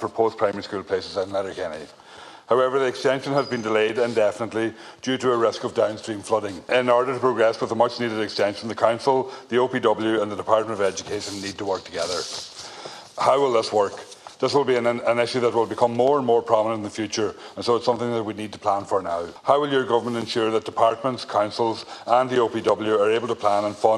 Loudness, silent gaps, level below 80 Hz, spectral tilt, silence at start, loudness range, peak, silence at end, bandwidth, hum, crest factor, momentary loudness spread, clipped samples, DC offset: -23 LUFS; none; -66 dBFS; -4.5 dB/octave; 0 s; 3 LU; -2 dBFS; 0 s; 12 kHz; none; 20 dB; 10 LU; under 0.1%; under 0.1%